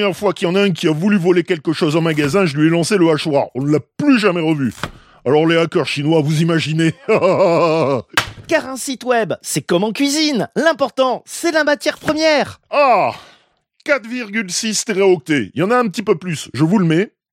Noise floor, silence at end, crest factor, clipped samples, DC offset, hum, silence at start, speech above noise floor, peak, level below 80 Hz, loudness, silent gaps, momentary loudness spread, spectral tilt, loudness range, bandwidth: -57 dBFS; 0.25 s; 14 dB; under 0.1%; under 0.1%; none; 0 s; 41 dB; -2 dBFS; -54 dBFS; -16 LUFS; none; 6 LU; -5 dB/octave; 2 LU; 16.5 kHz